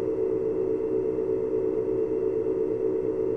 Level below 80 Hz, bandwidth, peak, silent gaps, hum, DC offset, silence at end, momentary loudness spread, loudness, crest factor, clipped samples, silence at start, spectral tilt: -52 dBFS; 3.4 kHz; -16 dBFS; none; none; under 0.1%; 0 s; 1 LU; -27 LUFS; 10 dB; under 0.1%; 0 s; -10 dB/octave